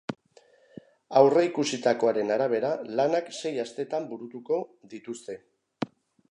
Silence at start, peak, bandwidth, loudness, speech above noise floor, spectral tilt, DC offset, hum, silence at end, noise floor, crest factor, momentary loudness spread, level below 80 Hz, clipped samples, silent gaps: 0.1 s; -4 dBFS; 11 kHz; -26 LUFS; 33 dB; -5 dB/octave; under 0.1%; none; 0.45 s; -60 dBFS; 24 dB; 19 LU; -80 dBFS; under 0.1%; none